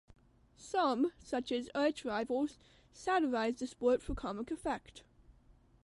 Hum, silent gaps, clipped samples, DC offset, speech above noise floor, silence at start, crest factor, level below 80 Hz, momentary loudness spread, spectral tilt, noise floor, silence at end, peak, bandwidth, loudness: none; none; under 0.1%; under 0.1%; 29 dB; 0.6 s; 18 dB; -56 dBFS; 8 LU; -4.5 dB/octave; -65 dBFS; 0.55 s; -20 dBFS; 11.5 kHz; -36 LUFS